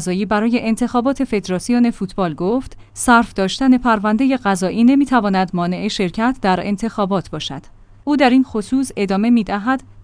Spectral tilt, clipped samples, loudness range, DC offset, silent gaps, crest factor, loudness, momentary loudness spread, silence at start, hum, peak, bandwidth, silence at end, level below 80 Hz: -5.5 dB/octave; under 0.1%; 3 LU; under 0.1%; none; 16 dB; -17 LUFS; 8 LU; 0 s; none; 0 dBFS; 10.5 kHz; 0 s; -42 dBFS